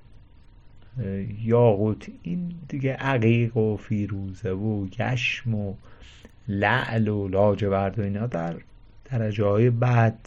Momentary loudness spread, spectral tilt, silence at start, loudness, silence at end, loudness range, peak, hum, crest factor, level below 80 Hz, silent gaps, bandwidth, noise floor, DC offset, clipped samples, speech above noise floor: 12 LU; -8 dB/octave; 0.1 s; -25 LUFS; 0.1 s; 3 LU; -6 dBFS; none; 18 dB; -48 dBFS; none; 7.2 kHz; -49 dBFS; under 0.1%; under 0.1%; 25 dB